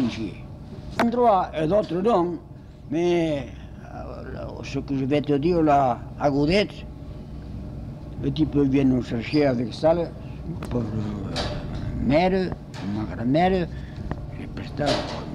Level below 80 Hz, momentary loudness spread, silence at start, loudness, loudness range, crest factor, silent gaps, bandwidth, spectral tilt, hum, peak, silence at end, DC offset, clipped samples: -40 dBFS; 17 LU; 0 s; -24 LUFS; 3 LU; 16 dB; none; 11.5 kHz; -7 dB/octave; none; -8 dBFS; 0 s; under 0.1%; under 0.1%